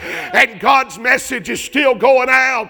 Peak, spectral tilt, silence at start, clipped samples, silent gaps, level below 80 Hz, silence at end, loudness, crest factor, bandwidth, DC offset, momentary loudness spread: 0 dBFS; -2.5 dB/octave; 0 s; 0.2%; none; -52 dBFS; 0 s; -13 LUFS; 14 dB; 20 kHz; under 0.1%; 7 LU